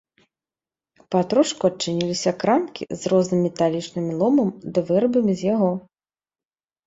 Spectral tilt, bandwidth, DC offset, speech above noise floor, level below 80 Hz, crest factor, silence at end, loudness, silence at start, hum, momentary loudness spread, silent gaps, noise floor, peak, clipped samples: -6 dB/octave; 8 kHz; under 0.1%; over 69 dB; -62 dBFS; 18 dB; 1.05 s; -21 LUFS; 1.1 s; none; 7 LU; none; under -90 dBFS; -4 dBFS; under 0.1%